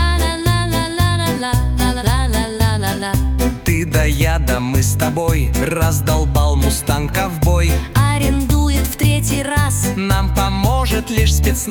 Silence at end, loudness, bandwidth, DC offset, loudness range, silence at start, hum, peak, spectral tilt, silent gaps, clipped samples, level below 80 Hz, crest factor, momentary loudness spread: 0 s; -16 LUFS; 19.5 kHz; under 0.1%; 1 LU; 0 s; none; -2 dBFS; -5 dB/octave; none; under 0.1%; -20 dBFS; 14 dB; 3 LU